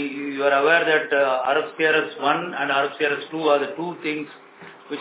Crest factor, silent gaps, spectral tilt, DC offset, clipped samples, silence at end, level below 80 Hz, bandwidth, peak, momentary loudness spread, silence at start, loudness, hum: 18 dB; none; -8 dB/octave; under 0.1%; under 0.1%; 0 s; -80 dBFS; 4 kHz; -6 dBFS; 11 LU; 0 s; -21 LUFS; none